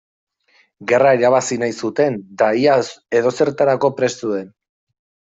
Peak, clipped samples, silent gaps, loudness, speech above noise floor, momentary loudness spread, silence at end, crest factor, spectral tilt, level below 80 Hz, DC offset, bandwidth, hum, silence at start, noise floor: -2 dBFS; under 0.1%; none; -17 LUFS; 42 dB; 8 LU; 0.9 s; 16 dB; -5 dB/octave; -64 dBFS; under 0.1%; 8 kHz; none; 0.8 s; -58 dBFS